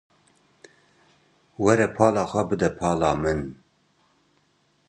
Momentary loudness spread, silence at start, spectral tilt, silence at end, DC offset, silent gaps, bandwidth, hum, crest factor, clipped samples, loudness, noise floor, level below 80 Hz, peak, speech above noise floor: 6 LU; 1.6 s; -6 dB/octave; 1.35 s; under 0.1%; none; 11 kHz; none; 24 dB; under 0.1%; -23 LUFS; -66 dBFS; -48 dBFS; -2 dBFS; 44 dB